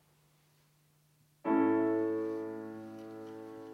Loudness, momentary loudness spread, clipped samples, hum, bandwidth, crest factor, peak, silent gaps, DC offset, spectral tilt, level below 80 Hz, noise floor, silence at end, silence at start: -33 LUFS; 18 LU; under 0.1%; none; 6.2 kHz; 18 dB; -18 dBFS; none; under 0.1%; -8 dB/octave; -84 dBFS; -69 dBFS; 0 s; 1.45 s